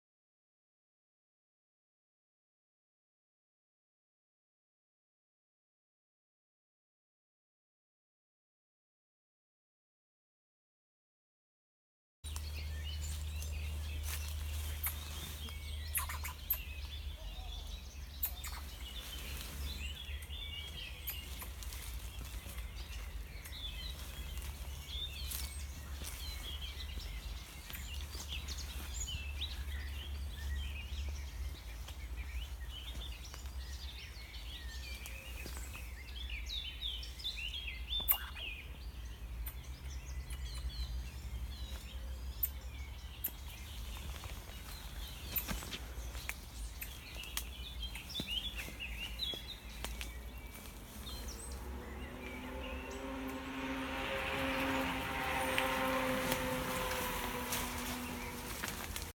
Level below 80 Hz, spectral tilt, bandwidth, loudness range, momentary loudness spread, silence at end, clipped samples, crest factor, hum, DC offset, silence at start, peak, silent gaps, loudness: -46 dBFS; -3.5 dB/octave; 19 kHz; 9 LU; 11 LU; 0 s; under 0.1%; 30 dB; none; under 0.1%; 12.25 s; -12 dBFS; none; -42 LUFS